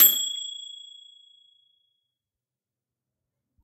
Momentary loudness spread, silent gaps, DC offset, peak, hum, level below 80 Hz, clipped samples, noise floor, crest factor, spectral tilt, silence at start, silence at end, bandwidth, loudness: 25 LU; none; under 0.1%; -4 dBFS; none; -86 dBFS; under 0.1%; -90 dBFS; 26 dB; 2.5 dB/octave; 0 s; 2.85 s; 16 kHz; -23 LUFS